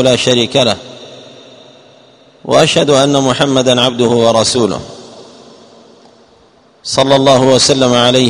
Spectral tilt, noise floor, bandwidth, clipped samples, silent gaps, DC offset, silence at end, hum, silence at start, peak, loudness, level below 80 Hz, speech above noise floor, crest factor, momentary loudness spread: -4 dB/octave; -47 dBFS; 12 kHz; 0.4%; none; under 0.1%; 0 s; none; 0 s; 0 dBFS; -10 LUFS; -48 dBFS; 37 dB; 12 dB; 15 LU